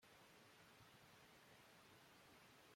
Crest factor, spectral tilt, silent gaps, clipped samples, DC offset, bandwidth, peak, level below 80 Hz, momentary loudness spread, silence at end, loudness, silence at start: 12 dB; -3 dB/octave; none; under 0.1%; under 0.1%; 16.5 kHz; -56 dBFS; -90 dBFS; 0 LU; 0 s; -67 LUFS; 0 s